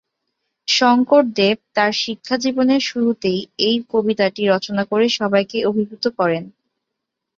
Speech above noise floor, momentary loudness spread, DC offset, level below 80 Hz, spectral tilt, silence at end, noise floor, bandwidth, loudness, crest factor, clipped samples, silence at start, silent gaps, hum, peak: 62 dB; 7 LU; under 0.1%; -62 dBFS; -4.5 dB/octave; 0.9 s; -80 dBFS; 7.6 kHz; -18 LUFS; 16 dB; under 0.1%; 0.7 s; none; none; -2 dBFS